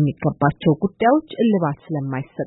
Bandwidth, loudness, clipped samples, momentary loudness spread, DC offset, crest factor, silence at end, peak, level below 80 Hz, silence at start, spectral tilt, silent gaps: 4.1 kHz; -20 LUFS; under 0.1%; 8 LU; under 0.1%; 16 dB; 0 s; -4 dBFS; -50 dBFS; 0 s; -12.5 dB/octave; none